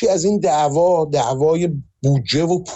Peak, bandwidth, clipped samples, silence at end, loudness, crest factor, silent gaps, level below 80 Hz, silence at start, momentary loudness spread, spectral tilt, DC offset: -8 dBFS; 8.4 kHz; under 0.1%; 0 s; -17 LUFS; 10 dB; none; -50 dBFS; 0 s; 4 LU; -6 dB/octave; under 0.1%